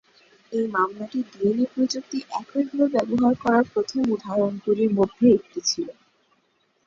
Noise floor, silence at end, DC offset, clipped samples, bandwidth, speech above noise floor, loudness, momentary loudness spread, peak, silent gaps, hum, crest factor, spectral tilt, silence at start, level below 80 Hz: -67 dBFS; 0.95 s; under 0.1%; under 0.1%; 7.6 kHz; 45 dB; -23 LUFS; 10 LU; -6 dBFS; none; none; 18 dB; -5 dB/octave; 0.5 s; -62 dBFS